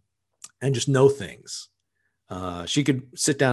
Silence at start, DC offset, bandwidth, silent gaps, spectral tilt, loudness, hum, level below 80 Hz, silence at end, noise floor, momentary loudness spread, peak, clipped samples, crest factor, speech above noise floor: 0.6 s; under 0.1%; 12.5 kHz; none; -4.5 dB/octave; -24 LUFS; none; -56 dBFS; 0 s; -76 dBFS; 17 LU; -6 dBFS; under 0.1%; 20 dB; 53 dB